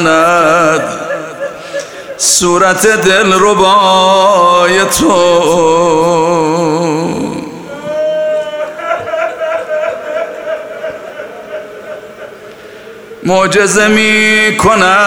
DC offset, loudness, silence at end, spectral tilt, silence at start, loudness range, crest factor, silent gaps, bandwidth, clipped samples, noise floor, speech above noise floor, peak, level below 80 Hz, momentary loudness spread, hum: under 0.1%; -9 LUFS; 0 s; -3 dB/octave; 0 s; 12 LU; 10 dB; none; 19.5 kHz; under 0.1%; -31 dBFS; 23 dB; 0 dBFS; -44 dBFS; 18 LU; none